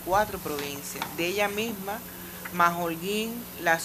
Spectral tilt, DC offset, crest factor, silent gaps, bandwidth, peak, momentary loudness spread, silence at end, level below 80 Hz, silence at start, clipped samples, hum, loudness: -3.5 dB/octave; under 0.1%; 22 dB; none; 15.5 kHz; -8 dBFS; 11 LU; 0 s; -54 dBFS; 0 s; under 0.1%; 60 Hz at -50 dBFS; -29 LUFS